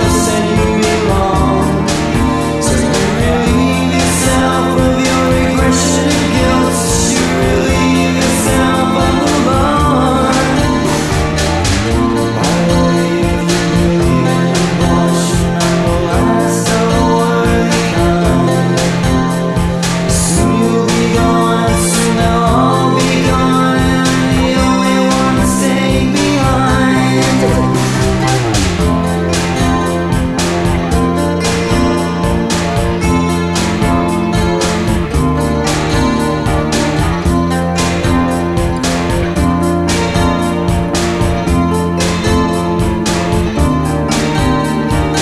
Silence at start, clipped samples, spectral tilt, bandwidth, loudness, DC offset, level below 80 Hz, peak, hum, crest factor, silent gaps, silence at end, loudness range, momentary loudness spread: 0 s; under 0.1%; -5 dB/octave; 14 kHz; -12 LUFS; under 0.1%; -22 dBFS; 0 dBFS; none; 12 dB; none; 0 s; 2 LU; 3 LU